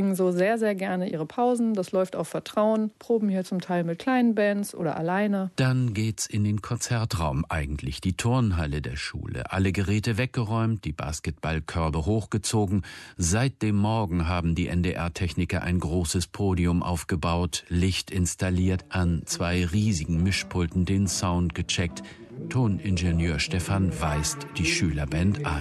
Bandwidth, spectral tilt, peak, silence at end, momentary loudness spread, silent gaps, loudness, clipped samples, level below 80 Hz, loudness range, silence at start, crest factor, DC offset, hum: 12.5 kHz; -5.5 dB/octave; -12 dBFS; 0 s; 6 LU; none; -26 LUFS; under 0.1%; -38 dBFS; 2 LU; 0 s; 14 dB; under 0.1%; none